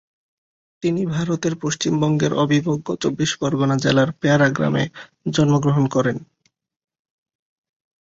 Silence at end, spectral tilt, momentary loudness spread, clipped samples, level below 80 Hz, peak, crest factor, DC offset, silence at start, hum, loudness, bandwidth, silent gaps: 1.75 s; -5.5 dB/octave; 7 LU; under 0.1%; -54 dBFS; -4 dBFS; 16 dB; under 0.1%; 0.85 s; none; -20 LUFS; 7.8 kHz; none